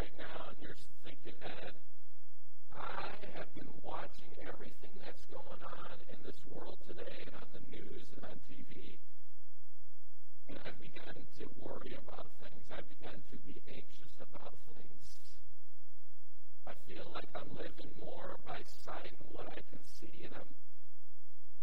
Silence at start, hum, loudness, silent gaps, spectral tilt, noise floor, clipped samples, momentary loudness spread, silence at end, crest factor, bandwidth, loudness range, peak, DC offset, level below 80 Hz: 0 s; none; -52 LUFS; none; -6 dB/octave; -72 dBFS; under 0.1%; 11 LU; 0 s; 22 dB; 16.5 kHz; 6 LU; -22 dBFS; 6%; -66 dBFS